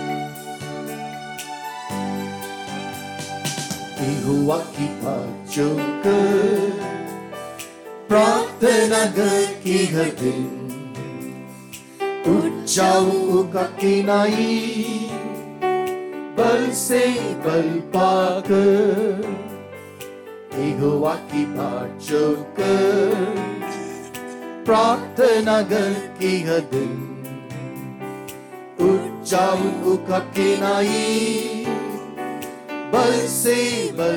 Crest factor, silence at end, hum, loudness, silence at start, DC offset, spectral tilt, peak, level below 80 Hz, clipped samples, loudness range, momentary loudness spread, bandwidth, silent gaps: 16 dB; 0 s; none; -21 LUFS; 0 s; under 0.1%; -4.5 dB/octave; -4 dBFS; -62 dBFS; under 0.1%; 6 LU; 16 LU; 19 kHz; none